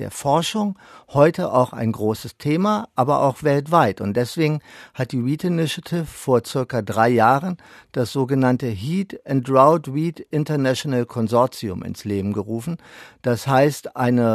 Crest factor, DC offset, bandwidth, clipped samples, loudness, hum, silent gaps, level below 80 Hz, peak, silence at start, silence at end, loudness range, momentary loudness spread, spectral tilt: 20 dB; under 0.1%; 14 kHz; under 0.1%; -21 LUFS; none; none; -58 dBFS; 0 dBFS; 0 s; 0 s; 3 LU; 11 LU; -6.5 dB/octave